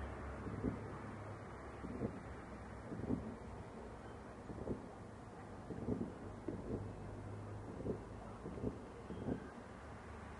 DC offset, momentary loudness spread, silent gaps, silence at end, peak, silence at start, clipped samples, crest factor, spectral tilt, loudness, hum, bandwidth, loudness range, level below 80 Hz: under 0.1%; 9 LU; none; 0 s; -26 dBFS; 0 s; under 0.1%; 20 dB; -8 dB/octave; -48 LUFS; none; 11 kHz; 2 LU; -58 dBFS